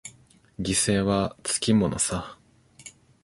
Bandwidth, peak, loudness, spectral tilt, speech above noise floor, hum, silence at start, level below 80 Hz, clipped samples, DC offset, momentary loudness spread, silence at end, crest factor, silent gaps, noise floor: 12 kHz; -10 dBFS; -24 LUFS; -4 dB/octave; 30 dB; none; 0.05 s; -48 dBFS; under 0.1%; under 0.1%; 24 LU; 0.35 s; 18 dB; none; -54 dBFS